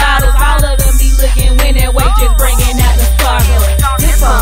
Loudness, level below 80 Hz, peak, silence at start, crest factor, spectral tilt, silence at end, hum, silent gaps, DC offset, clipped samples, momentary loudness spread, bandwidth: -11 LUFS; -8 dBFS; 0 dBFS; 0 s; 8 dB; -4 dB/octave; 0 s; none; none; under 0.1%; under 0.1%; 1 LU; 16.5 kHz